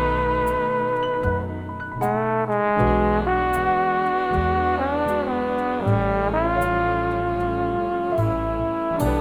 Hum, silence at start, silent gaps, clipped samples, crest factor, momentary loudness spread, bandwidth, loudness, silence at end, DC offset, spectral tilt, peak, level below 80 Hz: none; 0 s; none; under 0.1%; 16 dB; 4 LU; over 20 kHz; -22 LUFS; 0 s; under 0.1%; -7.5 dB/octave; -4 dBFS; -34 dBFS